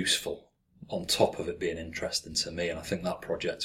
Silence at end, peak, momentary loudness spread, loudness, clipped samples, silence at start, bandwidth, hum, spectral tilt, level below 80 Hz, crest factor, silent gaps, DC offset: 0 s; -10 dBFS; 10 LU; -31 LUFS; under 0.1%; 0 s; 16.5 kHz; none; -3 dB/octave; -54 dBFS; 22 dB; none; under 0.1%